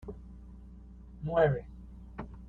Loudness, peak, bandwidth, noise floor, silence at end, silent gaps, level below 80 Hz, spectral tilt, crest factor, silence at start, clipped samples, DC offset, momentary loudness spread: -30 LUFS; -14 dBFS; 4.3 kHz; -50 dBFS; 0 s; none; -48 dBFS; -9.5 dB/octave; 22 dB; 0.05 s; under 0.1%; under 0.1%; 25 LU